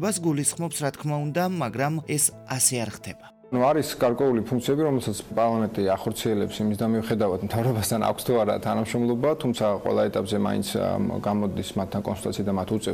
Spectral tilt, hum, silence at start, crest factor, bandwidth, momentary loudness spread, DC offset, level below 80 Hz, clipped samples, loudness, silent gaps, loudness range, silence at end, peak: -5 dB/octave; none; 0 s; 18 dB; 19 kHz; 6 LU; under 0.1%; -56 dBFS; under 0.1%; -25 LUFS; none; 1 LU; 0 s; -6 dBFS